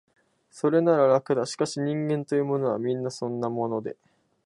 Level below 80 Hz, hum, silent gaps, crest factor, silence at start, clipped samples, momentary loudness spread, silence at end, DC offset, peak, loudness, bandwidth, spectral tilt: -74 dBFS; none; none; 18 dB; 0.55 s; under 0.1%; 9 LU; 0.5 s; under 0.1%; -8 dBFS; -26 LUFS; 11.5 kHz; -6.5 dB/octave